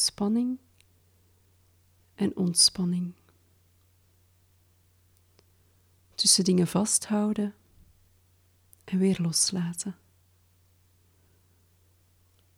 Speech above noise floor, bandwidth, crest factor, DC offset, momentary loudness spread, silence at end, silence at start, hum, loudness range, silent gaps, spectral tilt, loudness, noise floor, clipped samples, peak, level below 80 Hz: 38 dB; 16.5 kHz; 24 dB; under 0.1%; 15 LU; 2.65 s; 0 s; none; 5 LU; none; -3.5 dB/octave; -25 LUFS; -64 dBFS; under 0.1%; -8 dBFS; -66 dBFS